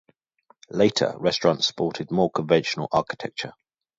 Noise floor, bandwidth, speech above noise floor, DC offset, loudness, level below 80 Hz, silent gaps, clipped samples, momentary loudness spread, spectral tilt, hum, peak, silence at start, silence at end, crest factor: -62 dBFS; 7.8 kHz; 38 dB; under 0.1%; -24 LUFS; -60 dBFS; none; under 0.1%; 11 LU; -5 dB/octave; none; -4 dBFS; 0.75 s; 0.5 s; 20 dB